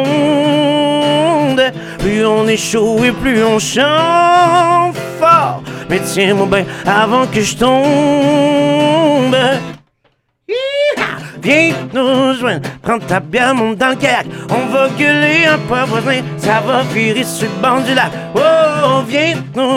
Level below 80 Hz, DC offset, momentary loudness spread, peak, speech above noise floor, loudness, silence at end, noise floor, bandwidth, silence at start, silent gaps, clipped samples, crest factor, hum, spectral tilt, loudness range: -42 dBFS; under 0.1%; 8 LU; 0 dBFS; 47 dB; -12 LUFS; 0 s; -59 dBFS; 17 kHz; 0 s; none; under 0.1%; 12 dB; none; -4.5 dB/octave; 3 LU